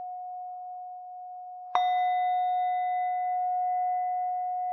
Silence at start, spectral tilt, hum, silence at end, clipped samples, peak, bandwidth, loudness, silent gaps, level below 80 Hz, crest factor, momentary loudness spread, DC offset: 0 s; -1 dB/octave; none; 0 s; under 0.1%; -10 dBFS; 6 kHz; -29 LUFS; none; under -90 dBFS; 20 dB; 15 LU; under 0.1%